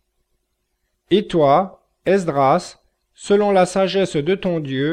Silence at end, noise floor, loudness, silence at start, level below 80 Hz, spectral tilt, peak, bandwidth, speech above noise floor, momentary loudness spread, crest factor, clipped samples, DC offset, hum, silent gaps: 0 s; -71 dBFS; -18 LUFS; 1.1 s; -52 dBFS; -6 dB/octave; -4 dBFS; 10.5 kHz; 55 dB; 9 LU; 16 dB; under 0.1%; under 0.1%; none; none